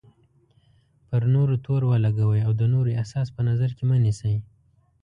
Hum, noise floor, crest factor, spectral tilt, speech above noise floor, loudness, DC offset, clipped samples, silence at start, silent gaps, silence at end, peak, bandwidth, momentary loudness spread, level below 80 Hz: none; -62 dBFS; 12 dB; -9 dB/octave; 40 dB; -23 LUFS; under 0.1%; under 0.1%; 1.1 s; none; 0.6 s; -10 dBFS; 9.2 kHz; 6 LU; -50 dBFS